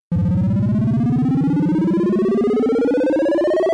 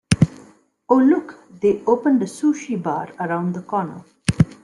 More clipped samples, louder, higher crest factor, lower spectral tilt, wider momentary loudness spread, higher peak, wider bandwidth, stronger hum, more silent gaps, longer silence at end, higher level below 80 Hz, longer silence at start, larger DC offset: neither; about the same, -18 LUFS vs -20 LUFS; second, 6 dB vs 20 dB; first, -9.5 dB/octave vs -7 dB/octave; second, 1 LU vs 9 LU; second, -10 dBFS vs 0 dBFS; second, 10 kHz vs 11.5 kHz; neither; neither; about the same, 0 s vs 0.1 s; about the same, -44 dBFS vs -46 dBFS; about the same, 0.1 s vs 0.1 s; neither